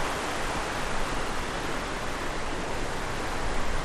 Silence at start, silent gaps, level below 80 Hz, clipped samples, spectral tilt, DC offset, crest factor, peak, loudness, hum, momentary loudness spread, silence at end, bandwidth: 0 s; none; -34 dBFS; under 0.1%; -3.5 dB/octave; under 0.1%; 12 dB; -16 dBFS; -31 LUFS; none; 2 LU; 0 s; 14 kHz